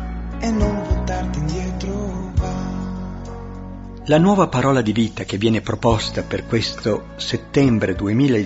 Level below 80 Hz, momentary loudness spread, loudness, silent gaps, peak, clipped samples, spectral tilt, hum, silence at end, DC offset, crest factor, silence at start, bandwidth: -30 dBFS; 14 LU; -20 LUFS; none; -2 dBFS; under 0.1%; -6.5 dB/octave; none; 0 s; under 0.1%; 18 dB; 0 s; 8 kHz